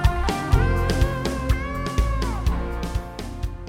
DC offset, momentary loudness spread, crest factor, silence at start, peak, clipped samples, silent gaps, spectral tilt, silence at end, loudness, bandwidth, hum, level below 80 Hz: under 0.1%; 9 LU; 18 dB; 0 s; -4 dBFS; under 0.1%; none; -6 dB/octave; 0 s; -25 LUFS; 16 kHz; none; -24 dBFS